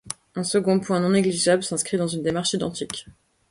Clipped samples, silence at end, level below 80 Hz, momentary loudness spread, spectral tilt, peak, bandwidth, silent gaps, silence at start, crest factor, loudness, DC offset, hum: under 0.1%; 0.4 s; -58 dBFS; 12 LU; -4.5 dB/octave; -6 dBFS; 11.5 kHz; none; 0.05 s; 18 dB; -23 LUFS; under 0.1%; none